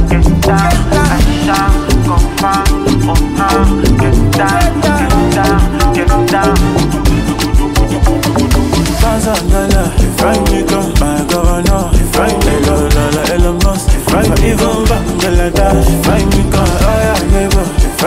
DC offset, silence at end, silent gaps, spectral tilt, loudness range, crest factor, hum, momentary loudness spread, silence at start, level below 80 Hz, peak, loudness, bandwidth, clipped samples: 0.3%; 0 s; none; -5.5 dB/octave; 1 LU; 10 dB; none; 2 LU; 0 s; -14 dBFS; 0 dBFS; -11 LUFS; 16.5 kHz; under 0.1%